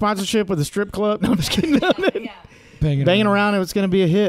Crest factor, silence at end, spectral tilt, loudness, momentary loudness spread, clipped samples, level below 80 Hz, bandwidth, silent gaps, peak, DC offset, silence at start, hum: 14 dB; 0 s; -5.5 dB/octave; -19 LUFS; 6 LU; under 0.1%; -42 dBFS; 15.5 kHz; none; -4 dBFS; under 0.1%; 0 s; none